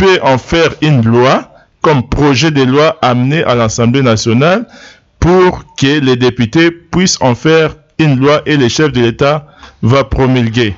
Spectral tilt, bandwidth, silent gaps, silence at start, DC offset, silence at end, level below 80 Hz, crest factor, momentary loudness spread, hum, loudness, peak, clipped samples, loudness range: -5.5 dB/octave; 8 kHz; none; 0 s; under 0.1%; 0 s; -30 dBFS; 10 dB; 4 LU; none; -10 LUFS; 0 dBFS; under 0.1%; 1 LU